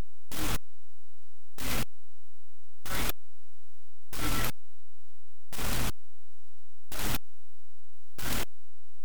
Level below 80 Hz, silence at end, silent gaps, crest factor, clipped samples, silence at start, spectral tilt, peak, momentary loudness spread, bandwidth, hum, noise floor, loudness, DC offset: -44 dBFS; 0.6 s; none; 24 dB; under 0.1%; 0.3 s; -3.5 dB/octave; -12 dBFS; 11 LU; over 20 kHz; none; -72 dBFS; -35 LUFS; 8%